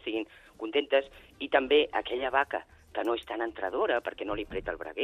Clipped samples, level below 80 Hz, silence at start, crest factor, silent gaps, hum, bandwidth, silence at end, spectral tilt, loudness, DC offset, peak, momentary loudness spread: under 0.1%; -56 dBFS; 0.05 s; 22 dB; none; none; 9.8 kHz; 0 s; -5 dB/octave; -30 LUFS; under 0.1%; -8 dBFS; 13 LU